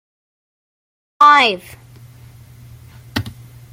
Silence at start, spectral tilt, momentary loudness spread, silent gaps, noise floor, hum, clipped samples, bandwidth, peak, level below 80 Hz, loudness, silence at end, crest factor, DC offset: 1.2 s; -3.5 dB/octave; 19 LU; none; -41 dBFS; none; under 0.1%; 16.5 kHz; -2 dBFS; -52 dBFS; -13 LUFS; 0.4 s; 18 dB; under 0.1%